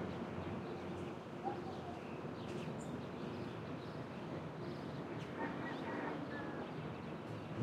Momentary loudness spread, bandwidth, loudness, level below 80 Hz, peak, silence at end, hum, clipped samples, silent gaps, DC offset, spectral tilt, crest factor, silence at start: 4 LU; 14.5 kHz; -45 LUFS; -72 dBFS; -28 dBFS; 0 s; none; under 0.1%; none; under 0.1%; -7 dB/octave; 18 dB; 0 s